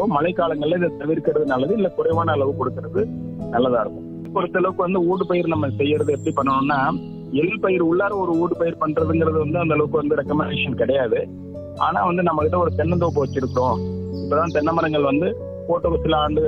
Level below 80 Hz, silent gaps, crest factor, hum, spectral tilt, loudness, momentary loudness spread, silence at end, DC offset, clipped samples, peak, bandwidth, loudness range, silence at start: -46 dBFS; none; 16 dB; none; -8 dB/octave; -21 LUFS; 6 LU; 0 s; under 0.1%; under 0.1%; -4 dBFS; 8.8 kHz; 2 LU; 0 s